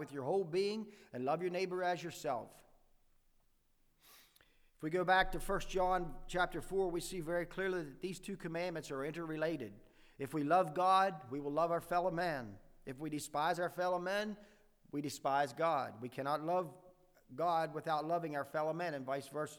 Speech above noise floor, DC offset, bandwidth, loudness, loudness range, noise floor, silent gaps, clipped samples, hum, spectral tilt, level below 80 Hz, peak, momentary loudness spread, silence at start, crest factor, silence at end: 36 dB; under 0.1%; over 20 kHz; -38 LUFS; 6 LU; -73 dBFS; none; under 0.1%; none; -5 dB/octave; -56 dBFS; -18 dBFS; 12 LU; 0 s; 20 dB; 0 s